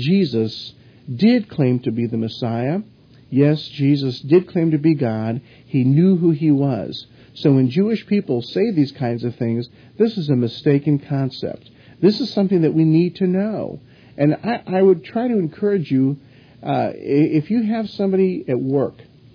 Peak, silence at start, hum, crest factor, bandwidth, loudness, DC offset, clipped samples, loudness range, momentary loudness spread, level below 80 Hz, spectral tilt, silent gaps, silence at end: -2 dBFS; 0 s; none; 16 dB; 5.4 kHz; -19 LUFS; under 0.1%; under 0.1%; 2 LU; 10 LU; -60 dBFS; -9.5 dB/octave; none; 0.45 s